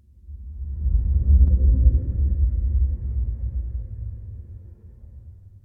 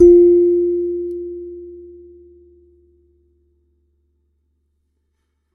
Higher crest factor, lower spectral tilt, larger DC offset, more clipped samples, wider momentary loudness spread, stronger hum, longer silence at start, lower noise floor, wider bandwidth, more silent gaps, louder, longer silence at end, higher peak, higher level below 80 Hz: about the same, 16 dB vs 18 dB; first, -14 dB/octave vs -11 dB/octave; neither; neither; second, 22 LU vs 26 LU; neither; first, 0.3 s vs 0 s; second, -43 dBFS vs -69 dBFS; about the same, 0.7 kHz vs 0.7 kHz; neither; second, -23 LUFS vs -15 LUFS; second, 0.35 s vs 3.75 s; second, -4 dBFS vs 0 dBFS; first, -22 dBFS vs -44 dBFS